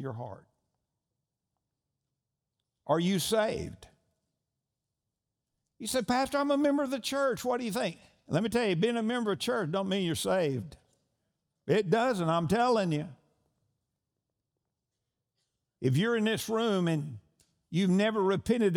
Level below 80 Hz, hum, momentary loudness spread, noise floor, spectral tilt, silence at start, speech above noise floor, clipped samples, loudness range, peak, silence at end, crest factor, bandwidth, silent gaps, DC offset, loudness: -64 dBFS; none; 12 LU; -87 dBFS; -5.5 dB/octave; 0 s; 58 dB; under 0.1%; 5 LU; -12 dBFS; 0 s; 18 dB; over 20 kHz; none; under 0.1%; -29 LUFS